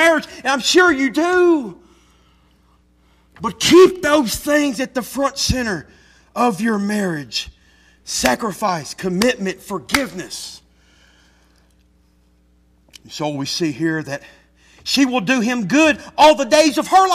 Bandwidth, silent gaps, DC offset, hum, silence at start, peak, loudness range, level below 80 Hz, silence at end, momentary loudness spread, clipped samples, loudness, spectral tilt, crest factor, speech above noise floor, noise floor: 15.5 kHz; none; under 0.1%; none; 0 s; -2 dBFS; 11 LU; -44 dBFS; 0 s; 16 LU; under 0.1%; -17 LUFS; -3.5 dB/octave; 16 dB; 39 dB; -56 dBFS